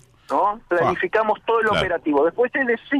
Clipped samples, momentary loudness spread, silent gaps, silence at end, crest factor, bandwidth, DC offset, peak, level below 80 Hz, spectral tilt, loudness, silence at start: under 0.1%; 2 LU; none; 0 s; 12 dB; 11.5 kHz; under 0.1%; -8 dBFS; -50 dBFS; -6 dB/octave; -20 LUFS; 0.3 s